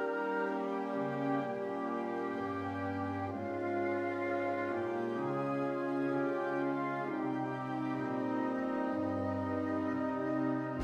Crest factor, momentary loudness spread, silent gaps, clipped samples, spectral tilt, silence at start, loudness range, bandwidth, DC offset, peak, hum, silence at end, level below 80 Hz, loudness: 14 dB; 3 LU; none; under 0.1%; -8 dB/octave; 0 s; 2 LU; 8.4 kHz; under 0.1%; -22 dBFS; none; 0 s; -74 dBFS; -36 LUFS